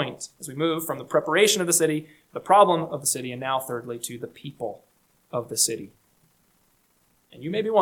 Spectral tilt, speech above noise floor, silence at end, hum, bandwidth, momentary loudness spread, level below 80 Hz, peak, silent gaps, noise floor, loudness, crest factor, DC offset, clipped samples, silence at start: -3 dB/octave; 41 dB; 0 s; none; 19 kHz; 17 LU; -70 dBFS; -4 dBFS; none; -65 dBFS; -24 LUFS; 22 dB; under 0.1%; under 0.1%; 0 s